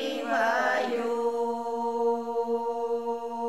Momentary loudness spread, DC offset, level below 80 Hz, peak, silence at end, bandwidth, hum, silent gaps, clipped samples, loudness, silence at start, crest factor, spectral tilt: 5 LU; 0.2%; -78 dBFS; -14 dBFS; 0 s; 13.5 kHz; none; none; under 0.1%; -28 LUFS; 0 s; 14 dB; -3.5 dB/octave